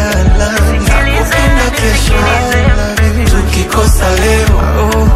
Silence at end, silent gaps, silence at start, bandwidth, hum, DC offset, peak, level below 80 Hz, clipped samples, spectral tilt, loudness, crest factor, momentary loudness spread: 0 s; none; 0 s; 15.5 kHz; none; under 0.1%; 0 dBFS; -12 dBFS; 0.2%; -5 dB/octave; -10 LUFS; 8 dB; 2 LU